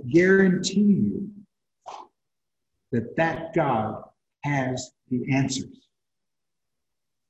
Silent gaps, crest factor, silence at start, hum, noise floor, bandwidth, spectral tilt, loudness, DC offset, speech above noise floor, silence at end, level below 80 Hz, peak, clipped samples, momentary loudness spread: none; 18 dB; 0 s; none; -87 dBFS; 8.6 kHz; -6 dB/octave; -24 LUFS; under 0.1%; 64 dB; 1.6 s; -60 dBFS; -6 dBFS; under 0.1%; 22 LU